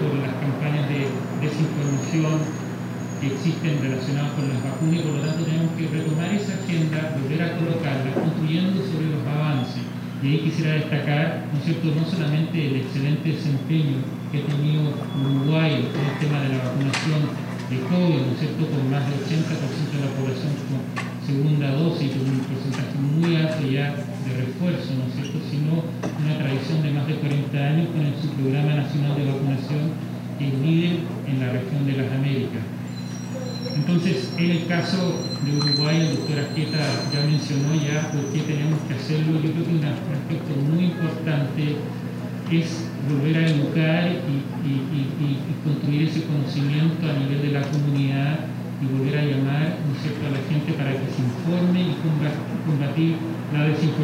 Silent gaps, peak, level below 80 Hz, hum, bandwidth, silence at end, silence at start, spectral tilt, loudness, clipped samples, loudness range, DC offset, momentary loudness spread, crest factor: none; -10 dBFS; -62 dBFS; 60 Hz at -35 dBFS; 15 kHz; 0 s; 0 s; -7 dB/octave; -23 LUFS; under 0.1%; 2 LU; under 0.1%; 6 LU; 12 dB